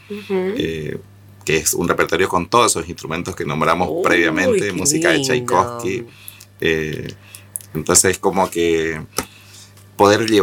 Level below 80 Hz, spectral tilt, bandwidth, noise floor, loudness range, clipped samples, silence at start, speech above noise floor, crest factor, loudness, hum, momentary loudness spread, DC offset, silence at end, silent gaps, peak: -46 dBFS; -3.5 dB/octave; 19 kHz; -43 dBFS; 2 LU; under 0.1%; 0.1 s; 25 dB; 18 dB; -17 LUFS; 50 Hz at -45 dBFS; 15 LU; under 0.1%; 0 s; none; 0 dBFS